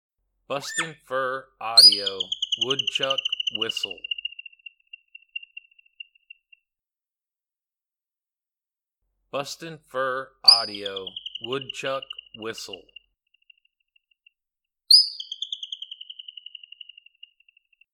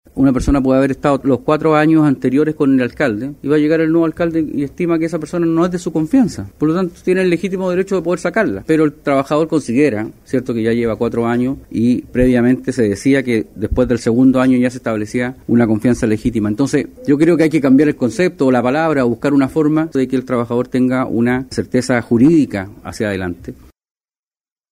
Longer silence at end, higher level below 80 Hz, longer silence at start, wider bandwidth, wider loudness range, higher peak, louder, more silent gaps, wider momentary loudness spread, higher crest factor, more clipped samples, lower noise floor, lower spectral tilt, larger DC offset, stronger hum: first, 1.8 s vs 1.2 s; second, -74 dBFS vs -38 dBFS; first, 0.5 s vs 0.15 s; first, 19 kHz vs 13.5 kHz; first, 20 LU vs 3 LU; about the same, 0 dBFS vs -2 dBFS; second, -21 LUFS vs -15 LUFS; neither; first, 24 LU vs 7 LU; first, 28 dB vs 14 dB; neither; about the same, under -90 dBFS vs under -90 dBFS; second, -0.5 dB/octave vs -7 dB/octave; neither; neither